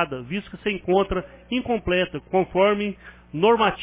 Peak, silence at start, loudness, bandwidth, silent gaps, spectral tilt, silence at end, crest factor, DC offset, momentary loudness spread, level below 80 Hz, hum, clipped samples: -6 dBFS; 0 s; -23 LUFS; 4 kHz; none; -10 dB/octave; 0 s; 16 dB; under 0.1%; 11 LU; -44 dBFS; none; under 0.1%